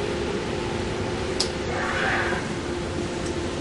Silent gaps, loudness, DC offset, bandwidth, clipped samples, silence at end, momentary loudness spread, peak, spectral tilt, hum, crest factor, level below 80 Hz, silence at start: none; -26 LUFS; under 0.1%; 11.5 kHz; under 0.1%; 0 s; 5 LU; -4 dBFS; -4.5 dB/octave; none; 22 dB; -40 dBFS; 0 s